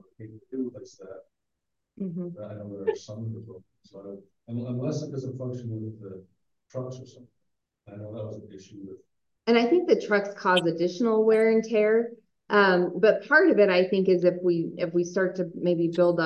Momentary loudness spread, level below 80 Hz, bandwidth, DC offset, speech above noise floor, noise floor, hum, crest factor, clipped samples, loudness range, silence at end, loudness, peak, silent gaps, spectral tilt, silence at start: 23 LU; -70 dBFS; 10 kHz; under 0.1%; 59 dB; -84 dBFS; none; 20 dB; under 0.1%; 17 LU; 0 s; -24 LUFS; -6 dBFS; none; -6.5 dB/octave; 0.2 s